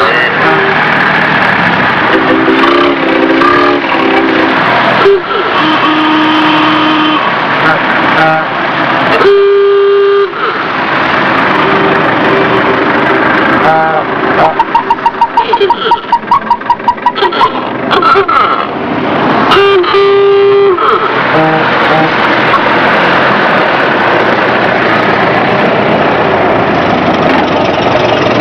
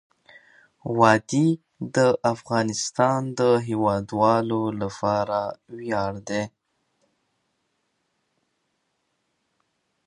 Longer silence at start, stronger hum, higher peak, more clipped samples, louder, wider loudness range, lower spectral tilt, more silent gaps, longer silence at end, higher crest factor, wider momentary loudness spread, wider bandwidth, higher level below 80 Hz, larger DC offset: second, 0 s vs 0.85 s; neither; about the same, 0 dBFS vs -2 dBFS; first, 1% vs under 0.1%; first, -8 LUFS vs -23 LUFS; second, 2 LU vs 12 LU; about the same, -6 dB/octave vs -5.5 dB/octave; neither; second, 0 s vs 3.6 s; second, 8 dB vs 24 dB; second, 4 LU vs 10 LU; second, 5.4 kHz vs 11 kHz; first, -42 dBFS vs -60 dBFS; neither